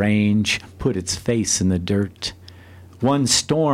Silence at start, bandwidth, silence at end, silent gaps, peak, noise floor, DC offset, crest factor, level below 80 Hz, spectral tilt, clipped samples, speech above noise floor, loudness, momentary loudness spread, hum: 0 s; 15.5 kHz; 0 s; none; -4 dBFS; -43 dBFS; under 0.1%; 16 dB; -46 dBFS; -4 dB/octave; under 0.1%; 23 dB; -20 LUFS; 8 LU; none